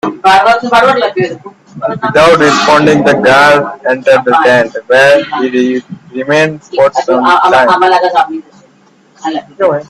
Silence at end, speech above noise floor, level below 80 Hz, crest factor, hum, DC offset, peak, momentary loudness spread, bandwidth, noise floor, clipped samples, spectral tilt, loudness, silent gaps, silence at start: 0.05 s; 37 dB; -48 dBFS; 8 dB; none; under 0.1%; 0 dBFS; 13 LU; 13.5 kHz; -45 dBFS; 0.2%; -4.5 dB/octave; -8 LUFS; none; 0.05 s